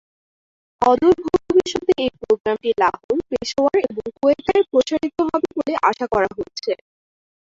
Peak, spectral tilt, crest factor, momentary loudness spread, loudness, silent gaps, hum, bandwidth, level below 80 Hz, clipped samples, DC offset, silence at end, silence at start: -4 dBFS; -4.5 dB/octave; 16 dB; 8 LU; -20 LUFS; 2.40-2.44 s, 3.04-3.09 s; none; 7.8 kHz; -50 dBFS; under 0.1%; under 0.1%; 0.65 s; 0.8 s